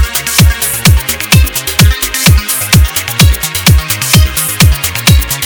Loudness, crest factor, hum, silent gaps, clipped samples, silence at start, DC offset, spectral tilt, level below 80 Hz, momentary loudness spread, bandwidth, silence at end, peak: -9 LUFS; 8 dB; none; none; 4%; 0 s; under 0.1%; -3.5 dB/octave; -14 dBFS; 2 LU; over 20 kHz; 0 s; 0 dBFS